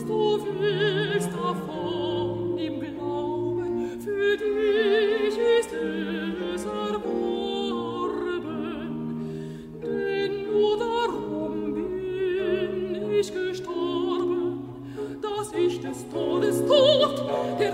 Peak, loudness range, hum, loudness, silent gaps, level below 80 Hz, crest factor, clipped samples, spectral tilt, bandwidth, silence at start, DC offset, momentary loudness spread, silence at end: -8 dBFS; 5 LU; none; -26 LUFS; none; -56 dBFS; 18 dB; under 0.1%; -5.5 dB/octave; 15.5 kHz; 0 s; under 0.1%; 10 LU; 0 s